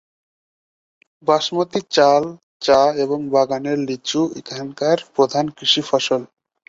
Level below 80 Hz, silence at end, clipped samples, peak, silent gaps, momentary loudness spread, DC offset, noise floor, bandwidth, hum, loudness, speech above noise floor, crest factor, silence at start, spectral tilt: -62 dBFS; 0.45 s; under 0.1%; -2 dBFS; 2.43-2.60 s; 9 LU; under 0.1%; under -90 dBFS; 7.8 kHz; none; -18 LUFS; over 72 dB; 18 dB; 1.25 s; -4 dB/octave